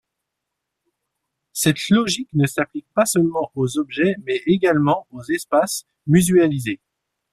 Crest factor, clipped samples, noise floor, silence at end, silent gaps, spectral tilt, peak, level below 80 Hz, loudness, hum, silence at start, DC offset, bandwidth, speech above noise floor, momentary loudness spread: 18 dB; under 0.1%; -81 dBFS; 0.6 s; none; -5 dB/octave; -2 dBFS; -56 dBFS; -19 LUFS; none; 1.55 s; under 0.1%; 15.5 kHz; 62 dB; 9 LU